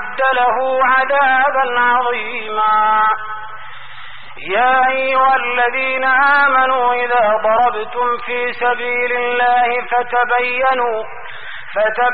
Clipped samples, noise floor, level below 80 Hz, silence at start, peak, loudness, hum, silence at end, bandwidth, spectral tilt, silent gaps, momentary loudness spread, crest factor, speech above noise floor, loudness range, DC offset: under 0.1%; -35 dBFS; -52 dBFS; 0 s; -4 dBFS; -14 LUFS; none; 0 s; 4.9 kHz; 1 dB/octave; none; 16 LU; 12 dB; 21 dB; 3 LU; 3%